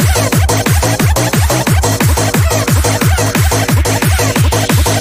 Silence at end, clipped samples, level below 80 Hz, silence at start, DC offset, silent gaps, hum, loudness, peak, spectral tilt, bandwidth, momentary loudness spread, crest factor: 0 s; under 0.1%; -18 dBFS; 0 s; under 0.1%; none; none; -11 LUFS; 0 dBFS; -4.5 dB/octave; 16 kHz; 1 LU; 10 dB